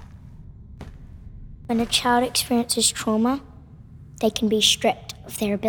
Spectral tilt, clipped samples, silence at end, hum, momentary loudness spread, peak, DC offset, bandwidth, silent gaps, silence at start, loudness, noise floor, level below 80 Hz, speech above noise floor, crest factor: -2.5 dB/octave; under 0.1%; 0 s; none; 24 LU; -4 dBFS; under 0.1%; over 20 kHz; none; 0 s; -21 LUFS; -44 dBFS; -46 dBFS; 23 dB; 20 dB